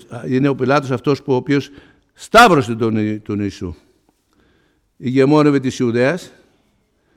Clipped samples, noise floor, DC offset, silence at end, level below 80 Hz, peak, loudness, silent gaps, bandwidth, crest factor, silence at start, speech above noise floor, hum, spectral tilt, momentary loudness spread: under 0.1%; -61 dBFS; under 0.1%; 0.9 s; -48 dBFS; 0 dBFS; -16 LUFS; none; 16 kHz; 16 dB; 0.1 s; 46 dB; none; -6 dB/octave; 15 LU